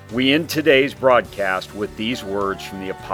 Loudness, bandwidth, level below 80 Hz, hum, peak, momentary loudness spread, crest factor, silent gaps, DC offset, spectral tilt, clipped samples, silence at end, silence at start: -19 LUFS; over 20 kHz; -48 dBFS; none; 0 dBFS; 13 LU; 20 dB; none; under 0.1%; -4.5 dB/octave; under 0.1%; 0 s; 0 s